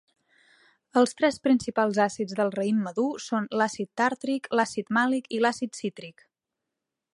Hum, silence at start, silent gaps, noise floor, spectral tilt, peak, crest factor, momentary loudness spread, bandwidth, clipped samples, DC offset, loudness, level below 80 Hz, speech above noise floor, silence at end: none; 0.95 s; none; -86 dBFS; -4.5 dB/octave; -8 dBFS; 20 dB; 8 LU; 11.5 kHz; under 0.1%; under 0.1%; -26 LUFS; -70 dBFS; 60 dB; 1.05 s